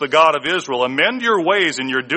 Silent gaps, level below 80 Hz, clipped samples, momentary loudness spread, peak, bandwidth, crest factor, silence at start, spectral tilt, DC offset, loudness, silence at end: none; -64 dBFS; under 0.1%; 6 LU; 0 dBFS; 8.8 kHz; 16 dB; 0 s; -3 dB/octave; under 0.1%; -16 LUFS; 0 s